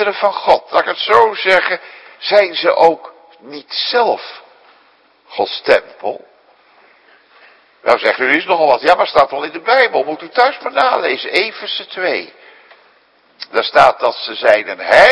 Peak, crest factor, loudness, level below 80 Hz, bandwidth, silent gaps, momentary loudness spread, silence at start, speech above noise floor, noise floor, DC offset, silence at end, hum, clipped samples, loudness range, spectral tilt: 0 dBFS; 14 dB; -14 LUFS; -54 dBFS; 11 kHz; none; 12 LU; 0 s; 39 dB; -52 dBFS; under 0.1%; 0 s; none; 0.4%; 6 LU; -3.5 dB/octave